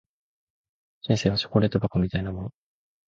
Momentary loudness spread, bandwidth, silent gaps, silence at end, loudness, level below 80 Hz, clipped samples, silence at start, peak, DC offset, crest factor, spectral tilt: 14 LU; 7.6 kHz; none; 0.6 s; -25 LUFS; -46 dBFS; under 0.1%; 1.05 s; -8 dBFS; under 0.1%; 20 dB; -6.5 dB/octave